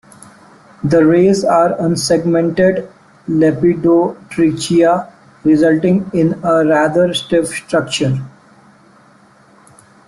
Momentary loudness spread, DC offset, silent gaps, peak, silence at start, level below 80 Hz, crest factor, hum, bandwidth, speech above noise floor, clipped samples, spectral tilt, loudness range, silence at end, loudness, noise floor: 8 LU; under 0.1%; none; -2 dBFS; 0.85 s; -50 dBFS; 12 dB; none; 12.5 kHz; 34 dB; under 0.1%; -6 dB/octave; 3 LU; 1.8 s; -14 LUFS; -47 dBFS